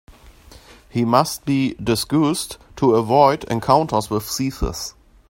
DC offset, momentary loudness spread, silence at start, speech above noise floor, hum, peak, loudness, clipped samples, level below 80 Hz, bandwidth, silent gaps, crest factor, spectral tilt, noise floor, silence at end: under 0.1%; 11 LU; 0.1 s; 27 dB; none; 0 dBFS; -19 LUFS; under 0.1%; -38 dBFS; 16.5 kHz; none; 20 dB; -5.5 dB/octave; -45 dBFS; 0.4 s